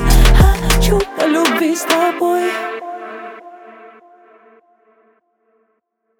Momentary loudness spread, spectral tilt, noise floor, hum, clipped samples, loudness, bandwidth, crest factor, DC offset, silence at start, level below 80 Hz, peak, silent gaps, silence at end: 18 LU; -5 dB/octave; -67 dBFS; none; under 0.1%; -15 LUFS; 19 kHz; 16 dB; under 0.1%; 0 s; -18 dBFS; 0 dBFS; none; 2.35 s